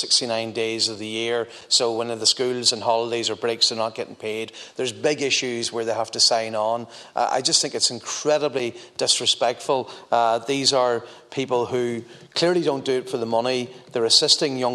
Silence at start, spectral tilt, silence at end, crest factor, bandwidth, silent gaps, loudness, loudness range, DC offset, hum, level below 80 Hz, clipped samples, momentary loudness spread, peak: 0 s; -2 dB/octave; 0 s; 20 dB; 13.5 kHz; none; -22 LUFS; 2 LU; under 0.1%; none; -72 dBFS; under 0.1%; 11 LU; -2 dBFS